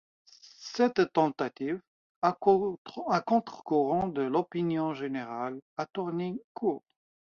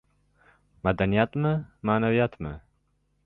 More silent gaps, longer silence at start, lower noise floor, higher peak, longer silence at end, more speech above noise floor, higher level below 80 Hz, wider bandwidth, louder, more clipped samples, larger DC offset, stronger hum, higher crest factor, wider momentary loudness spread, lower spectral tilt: first, 1.87-2.22 s, 2.78-2.85 s, 5.62-5.76 s, 6.44-6.55 s vs none; second, 0.45 s vs 0.85 s; second, -48 dBFS vs -70 dBFS; about the same, -8 dBFS vs -8 dBFS; about the same, 0.6 s vs 0.7 s; second, 19 dB vs 45 dB; second, -68 dBFS vs -48 dBFS; first, 7.2 kHz vs 5.4 kHz; second, -30 LUFS vs -26 LUFS; neither; neither; neither; about the same, 22 dB vs 20 dB; second, 11 LU vs 14 LU; second, -7 dB/octave vs -10.5 dB/octave